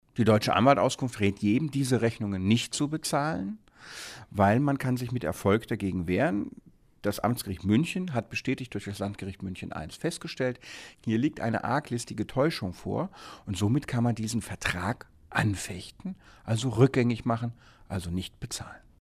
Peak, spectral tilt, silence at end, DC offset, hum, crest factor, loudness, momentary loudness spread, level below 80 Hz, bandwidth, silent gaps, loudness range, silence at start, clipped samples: -8 dBFS; -6 dB/octave; 0.2 s; under 0.1%; none; 20 dB; -29 LUFS; 14 LU; -54 dBFS; 15.5 kHz; none; 4 LU; 0.15 s; under 0.1%